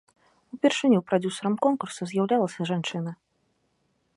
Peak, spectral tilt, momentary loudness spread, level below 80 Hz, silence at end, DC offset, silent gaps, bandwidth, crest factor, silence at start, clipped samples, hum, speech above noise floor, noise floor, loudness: -8 dBFS; -5.5 dB/octave; 10 LU; -74 dBFS; 1 s; under 0.1%; none; 11.5 kHz; 18 dB; 0.55 s; under 0.1%; none; 47 dB; -72 dBFS; -26 LUFS